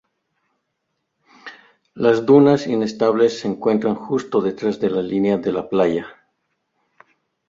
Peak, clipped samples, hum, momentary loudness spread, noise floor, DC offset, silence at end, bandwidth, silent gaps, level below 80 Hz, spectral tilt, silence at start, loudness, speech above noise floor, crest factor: -2 dBFS; under 0.1%; none; 12 LU; -75 dBFS; under 0.1%; 1.35 s; 7.6 kHz; none; -60 dBFS; -7 dB/octave; 1.45 s; -18 LUFS; 57 dB; 18 dB